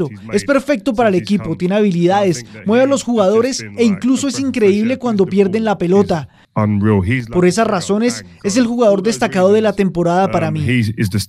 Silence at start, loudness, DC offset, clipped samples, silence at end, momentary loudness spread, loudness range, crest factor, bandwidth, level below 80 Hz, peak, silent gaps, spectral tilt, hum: 0 s; -15 LUFS; under 0.1%; under 0.1%; 0 s; 5 LU; 1 LU; 14 dB; 13.5 kHz; -46 dBFS; 0 dBFS; none; -6 dB/octave; none